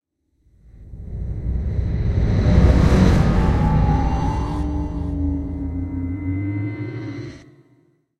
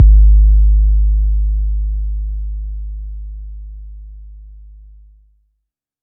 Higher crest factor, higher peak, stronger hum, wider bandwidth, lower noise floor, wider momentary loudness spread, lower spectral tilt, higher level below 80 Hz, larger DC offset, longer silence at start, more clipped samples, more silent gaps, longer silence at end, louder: about the same, 18 dB vs 14 dB; about the same, -2 dBFS vs 0 dBFS; neither; first, 8.8 kHz vs 0.4 kHz; second, -62 dBFS vs -73 dBFS; second, 15 LU vs 24 LU; second, -8 dB/octave vs -17.5 dB/octave; second, -24 dBFS vs -14 dBFS; neither; first, 0.8 s vs 0 s; neither; neither; second, 0.75 s vs 1.45 s; second, -20 LUFS vs -16 LUFS